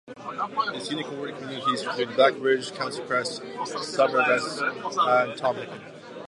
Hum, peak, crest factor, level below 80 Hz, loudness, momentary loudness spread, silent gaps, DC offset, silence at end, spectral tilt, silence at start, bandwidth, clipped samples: none; -6 dBFS; 20 dB; -76 dBFS; -26 LUFS; 13 LU; none; under 0.1%; 0.05 s; -3.5 dB/octave; 0.05 s; 11.5 kHz; under 0.1%